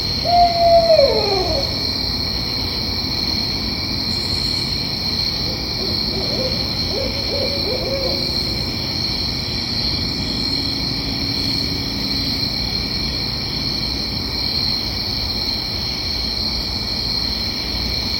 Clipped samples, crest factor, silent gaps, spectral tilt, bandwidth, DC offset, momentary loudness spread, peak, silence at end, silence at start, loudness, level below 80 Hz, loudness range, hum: under 0.1%; 18 dB; none; -4.5 dB/octave; 16.5 kHz; under 0.1%; 5 LU; -2 dBFS; 0 s; 0 s; -18 LUFS; -32 dBFS; 2 LU; none